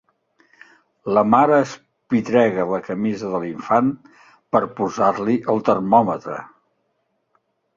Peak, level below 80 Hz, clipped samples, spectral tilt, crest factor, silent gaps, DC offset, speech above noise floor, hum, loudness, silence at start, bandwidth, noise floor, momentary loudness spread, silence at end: -2 dBFS; -60 dBFS; under 0.1%; -7 dB/octave; 18 dB; none; under 0.1%; 52 dB; none; -19 LUFS; 1.05 s; 7.4 kHz; -70 dBFS; 12 LU; 1.3 s